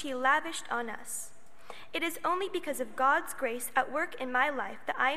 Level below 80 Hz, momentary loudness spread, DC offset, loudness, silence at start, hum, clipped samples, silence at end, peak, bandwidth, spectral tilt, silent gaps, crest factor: -72 dBFS; 11 LU; 0.8%; -31 LUFS; 0 s; none; under 0.1%; 0 s; -10 dBFS; 15 kHz; -1.5 dB/octave; none; 22 dB